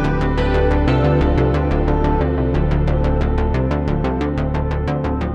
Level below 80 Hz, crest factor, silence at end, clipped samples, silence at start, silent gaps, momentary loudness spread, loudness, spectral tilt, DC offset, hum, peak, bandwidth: -20 dBFS; 12 dB; 0 s; under 0.1%; 0 s; none; 5 LU; -18 LUFS; -9 dB/octave; under 0.1%; none; -4 dBFS; 6.8 kHz